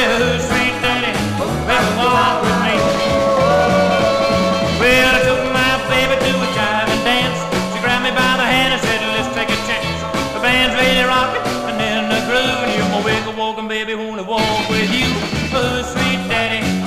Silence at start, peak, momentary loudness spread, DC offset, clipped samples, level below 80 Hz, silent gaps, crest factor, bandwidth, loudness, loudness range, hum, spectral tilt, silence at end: 0 s; -2 dBFS; 6 LU; 0.2%; under 0.1%; -36 dBFS; none; 14 dB; 16 kHz; -15 LUFS; 4 LU; none; -4 dB/octave; 0 s